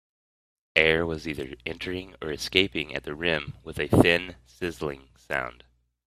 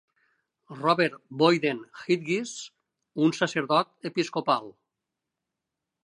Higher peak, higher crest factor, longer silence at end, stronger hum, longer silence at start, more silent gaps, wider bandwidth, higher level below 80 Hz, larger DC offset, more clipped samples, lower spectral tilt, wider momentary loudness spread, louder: first, 0 dBFS vs -8 dBFS; first, 28 dB vs 22 dB; second, 0.55 s vs 1.35 s; neither; about the same, 0.75 s vs 0.7 s; neither; first, 15 kHz vs 11 kHz; first, -50 dBFS vs -80 dBFS; neither; neither; about the same, -5 dB/octave vs -5 dB/octave; about the same, 14 LU vs 14 LU; about the same, -26 LUFS vs -26 LUFS